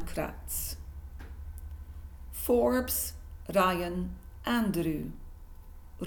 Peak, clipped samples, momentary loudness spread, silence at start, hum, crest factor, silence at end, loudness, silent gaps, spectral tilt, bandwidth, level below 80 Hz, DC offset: -12 dBFS; under 0.1%; 19 LU; 0 s; none; 20 dB; 0 s; -31 LUFS; none; -4.5 dB/octave; 19 kHz; -44 dBFS; under 0.1%